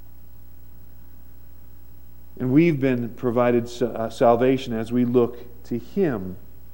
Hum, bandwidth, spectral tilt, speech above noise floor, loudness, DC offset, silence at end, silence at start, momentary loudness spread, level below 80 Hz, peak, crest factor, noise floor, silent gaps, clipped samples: 60 Hz at -45 dBFS; 16.5 kHz; -8 dB/octave; 26 dB; -22 LUFS; 1%; 0.35 s; 2.35 s; 14 LU; -50 dBFS; -6 dBFS; 18 dB; -47 dBFS; none; under 0.1%